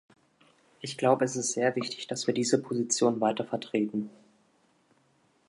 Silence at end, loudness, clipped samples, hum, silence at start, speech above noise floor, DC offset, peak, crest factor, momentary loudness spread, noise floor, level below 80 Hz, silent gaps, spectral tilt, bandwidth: 1.4 s; -29 LUFS; under 0.1%; none; 0.8 s; 39 dB; under 0.1%; -10 dBFS; 20 dB; 10 LU; -68 dBFS; -78 dBFS; none; -4 dB/octave; 11.5 kHz